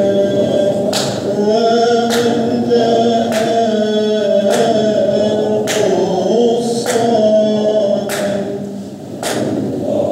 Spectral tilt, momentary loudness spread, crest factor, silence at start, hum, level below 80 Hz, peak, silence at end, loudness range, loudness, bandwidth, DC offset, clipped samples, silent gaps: -5 dB/octave; 7 LU; 12 dB; 0 s; none; -58 dBFS; -2 dBFS; 0 s; 2 LU; -14 LUFS; 16 kHz; under 0.1%; under 0.1%; none